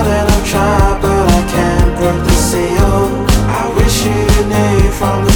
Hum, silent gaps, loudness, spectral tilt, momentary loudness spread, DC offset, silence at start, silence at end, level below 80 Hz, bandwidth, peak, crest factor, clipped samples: none; none; -12 LUFS; -5.5 dB/octave; 2 LU; under 0.1%; 0 s; 0 s; -16 dBFS; over 20 kHz; 0 dBFS; 10 dB; under 0.1%